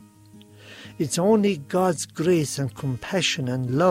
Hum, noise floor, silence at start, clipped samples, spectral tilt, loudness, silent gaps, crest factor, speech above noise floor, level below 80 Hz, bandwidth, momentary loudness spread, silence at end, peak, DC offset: none; -49 dBFS; 0.35 s; under 0.1%; -5 dB/octave; -23 LUFS; none; 16 dB; 27 dB; -60 dBFS; 16 kHz; 10 LU; 0 s; -8 dBFS; under 0.1%